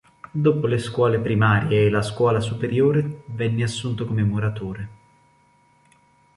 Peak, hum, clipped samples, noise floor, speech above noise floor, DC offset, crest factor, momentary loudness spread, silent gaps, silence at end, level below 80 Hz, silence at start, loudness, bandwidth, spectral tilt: -6 dBFS; none; under 0.1%; -59 dBFS; 38 dB; under 0.1%; 16 dB; 12 LU; none; 1.45 s; -50 dBFS; 0.35 s; -22 LUFS; 11.5 kHz; -7 dB/octave